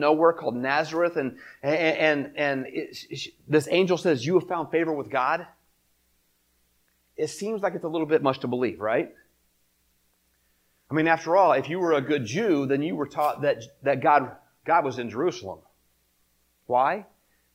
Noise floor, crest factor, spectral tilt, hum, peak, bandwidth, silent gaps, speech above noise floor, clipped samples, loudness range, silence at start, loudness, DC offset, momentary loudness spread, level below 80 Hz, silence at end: -68 dBFS; 20 dB; -5.5 dB/octave; none; -6 dBFS; 16.5 kHz; none; 44 dB; under 0.1%; 5 LU; 0 s; -25 LUFS; under 0.1%; 13 LU; -70 dBFS; 0.5 s